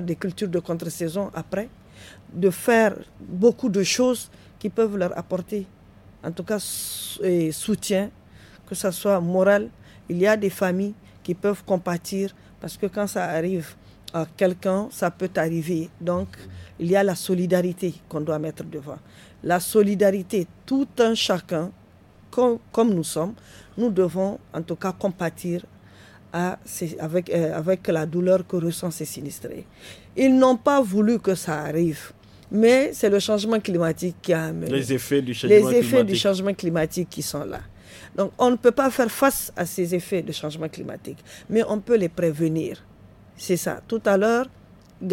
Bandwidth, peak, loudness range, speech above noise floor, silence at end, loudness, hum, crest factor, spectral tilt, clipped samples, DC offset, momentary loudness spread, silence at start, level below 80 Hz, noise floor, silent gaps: 17 kHz; -4 dBFS; 6 LU; 28 dB; 0 s; -23 LUFS; none; 20 dB; -5.5 dB/octave; under 0.1%; under 0.1%; 15 LU; 0 s; -56 dBFS; -51 dBFS; none